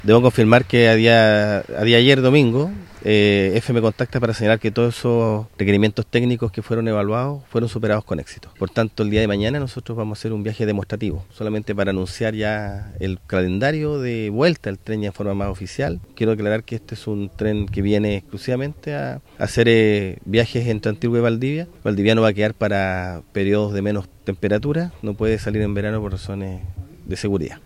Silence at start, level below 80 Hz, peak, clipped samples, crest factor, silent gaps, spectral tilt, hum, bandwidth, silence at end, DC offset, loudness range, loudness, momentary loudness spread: 0 s; -42 dBFS; 0 dBFS; under 0.1%; 20 dB; none; -6.5 dB/octave; none; 13.5 kHz; 0.1 s; under 0.1%; 7 LU; -20 LUFS; 13 LU